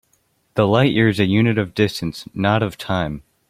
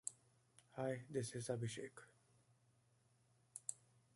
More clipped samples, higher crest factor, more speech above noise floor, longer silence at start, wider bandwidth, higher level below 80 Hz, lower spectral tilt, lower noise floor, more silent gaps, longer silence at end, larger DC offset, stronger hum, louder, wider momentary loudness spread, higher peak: neither; second, 18 dB vs 28 dB; first, 46 dB vs 31 dB; first, 0.55 s vs 0.05 s; first, 15.5 kHz vs 11.5 kHz; first, -48 dBFS vs -82 dBFS; first, -7 dB/octave vs -4.5 dB/octave; second, -64 dBFS vs -77 dBFS; neither; about the same, 0.3 s vs 0.4 s; neither; neither; first, -19 LUFS vs -48 LUFS; about the same, 11 LU vs 13 LU; first, 0 dBFS vs -24 dBFS